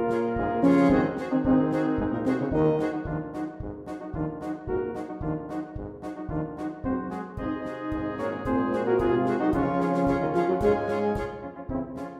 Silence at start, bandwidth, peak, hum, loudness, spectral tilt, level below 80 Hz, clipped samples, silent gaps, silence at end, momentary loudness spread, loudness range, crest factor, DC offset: 0 s; 10 kHz; -8 dBFS; none; -27 LUFS; -8.5 dB/octave; -44 dBFS; under 0.1%; none; 0 s; 12 LU; 8 LU; 18 dB; under 0.1%